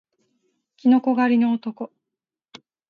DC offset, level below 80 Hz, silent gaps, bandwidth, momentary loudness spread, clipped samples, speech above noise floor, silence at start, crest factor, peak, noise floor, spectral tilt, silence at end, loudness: under 0.1%; -76 dBFS; none; 5.2 kHz; 17 LU; under 0.1%; 67 dB; 0.85 s; 16 dB; -6 dBFS; -86 dBFS; -7.5 dB/octave; 1.05 s; -20 LUFS